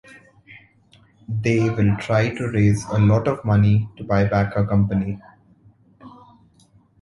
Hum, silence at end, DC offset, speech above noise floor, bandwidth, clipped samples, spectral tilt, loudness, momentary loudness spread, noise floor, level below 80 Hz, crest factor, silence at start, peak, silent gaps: none; 0.95 s; under 0.1%; 37 dB; 11.5 kHz; under 0.1%; -8 dB/octave; -20 LUFS; 7 LU; -56 dBFS; -42 dBFS; 16 dB; 0.5 s; -4 dBFS; none